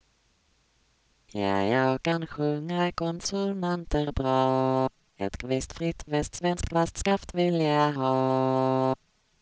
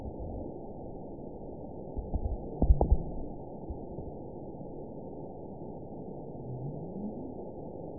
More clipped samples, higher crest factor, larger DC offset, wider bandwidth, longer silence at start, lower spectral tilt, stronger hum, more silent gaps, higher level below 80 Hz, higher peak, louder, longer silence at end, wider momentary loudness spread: neither; second, 18 dB vs 24 dB; second, under 0.1% vs 0.3%; first, 8 kHz vs 1 kHz; first, 1.35 s vs 0 s; about the same, -6 dB/octave vs -6 dB/octave; neither; neither; second, -46 dBFS vs -38 dBFS; about the same, -10 dBFS vs -10 dBFS; first, -27 LUFS vs -38 LUFS; first, 0.45 s vs 0 s; second, 7 LU vs 13 LU